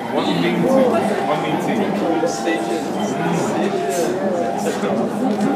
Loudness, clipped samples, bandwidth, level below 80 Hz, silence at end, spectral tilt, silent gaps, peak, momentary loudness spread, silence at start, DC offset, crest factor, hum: -19 LUFS; under 0.1%; 16 kHz; -60 dBFS; 0 s; -5.5 dB/octave; none; -4 dBFS; 5 LU; 0 s; under 0.1%; 16 dB; none